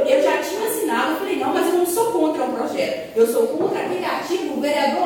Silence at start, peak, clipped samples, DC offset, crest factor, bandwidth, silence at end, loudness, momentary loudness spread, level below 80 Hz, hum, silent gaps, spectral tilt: 0 s; -4 dBFS; under 0.1%; under 0.1%; 16 dB; 17 kHz; 0 s; -20 LUFS; 5 LU; -62 dBFS; none; none; -3.5 dB/octave